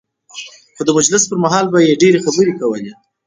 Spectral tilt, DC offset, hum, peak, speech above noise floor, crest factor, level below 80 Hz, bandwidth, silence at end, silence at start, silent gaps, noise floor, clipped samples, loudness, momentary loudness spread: -4 dB/octave; under 0.1%; none; 0 dBFS; 22 dB; 14 dB; -58 dBFS; 9.8 kHz; 0.35 s; 0.35 s; none; -35 dBFS; under 0.1%; -13 LUFS; 20 LU